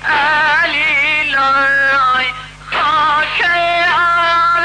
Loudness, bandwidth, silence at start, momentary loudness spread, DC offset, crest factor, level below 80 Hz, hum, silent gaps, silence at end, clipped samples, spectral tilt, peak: -12 LUFS; 10 kHz; 0 s; 4 LU; under 0.1%; 6 dB; -42 dBFS; 50 Hz at -40 dBFS; none; 0 s; under 0.1%; -2.5 dB/octave; -8 dBFS